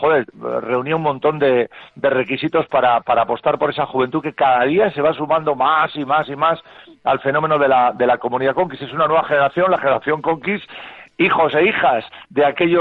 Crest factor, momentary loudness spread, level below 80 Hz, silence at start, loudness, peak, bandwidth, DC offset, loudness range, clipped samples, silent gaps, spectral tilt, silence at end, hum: 12 dB; 8 LU; -58 dBFS; 0 s; -17 LUFS; -4 dBFS; 4.8 kHz; under 0.1%; 1 LU; under 0.1%; none; -8.5 dB/octave; 0 s; none